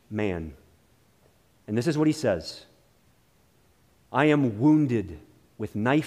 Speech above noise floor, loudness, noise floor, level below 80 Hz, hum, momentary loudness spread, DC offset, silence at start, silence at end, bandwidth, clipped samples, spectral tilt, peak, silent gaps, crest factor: 39 dB; -25 LUFS; -63 dBFS; -56 dBFS; none; 19 LU; under 0.1%; 0.1 s; 0 s; 12 kHz; under 0.1%; -7 dB/octave; -8 dBFS; none; 20 dB